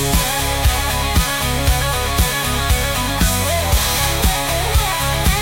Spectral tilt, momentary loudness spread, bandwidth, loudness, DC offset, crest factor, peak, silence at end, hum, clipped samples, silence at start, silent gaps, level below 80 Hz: -3 dB/octave; 2 LU; 17 kHz; -17 LUFS; under 0.1%; 14 dB; -4 dBFS; 0 s; none; under 0.1%; 0 s; none; -22 dBFS